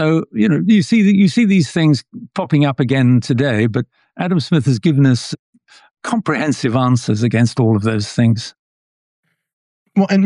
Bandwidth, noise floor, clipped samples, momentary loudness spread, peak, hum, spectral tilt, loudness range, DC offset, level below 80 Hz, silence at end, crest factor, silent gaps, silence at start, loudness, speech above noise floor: 11 kHz; under -90 dBFS; under 0.1%; 10 LU; -4 dBFS; none; -7 dB/octave; 4 LU; under 0.1%; -56 dBFS; 0 s; 12 dB; 5.39-5.53 s, 8.59-9.23 s, 9.53-9.86 s; 0 s; -15 LUFS; over 76 dB